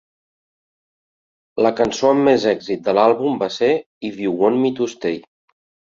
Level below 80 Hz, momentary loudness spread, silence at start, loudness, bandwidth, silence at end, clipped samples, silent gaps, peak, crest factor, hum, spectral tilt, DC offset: -58 dBFS; 10 LU; 1.55 s; -18 LUFS; 7.6 kHz; 0.65 s; under 0.1%; 3.86-4.01 s; -2 dBFS; 18 dB; none; -5.5 dB/octave; under 0.1%